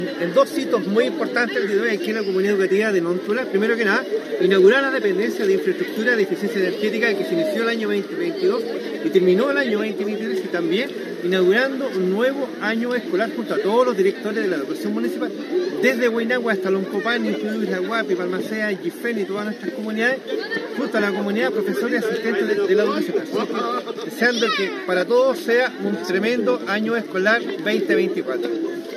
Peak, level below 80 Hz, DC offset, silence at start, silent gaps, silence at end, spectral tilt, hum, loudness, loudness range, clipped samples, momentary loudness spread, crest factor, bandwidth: -4 dBFS; under -90 dBFS; under 0.1%; 0 s; none; 0 s; -5.5 dB/octave; none; -21 LUFS; 4 LU; under 0.1%; 7 LU; 18 dB; 14.5 kHz